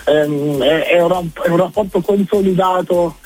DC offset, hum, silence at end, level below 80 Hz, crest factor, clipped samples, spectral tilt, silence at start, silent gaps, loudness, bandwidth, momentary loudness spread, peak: under 0.1%; none; 0.15 s; -44 dBFS; 14 dB; under 0.1%; -6.5 dB/octave; 0 s; none; -15 LUFS; 16.5 kHz; 4 LU; 0 dBFS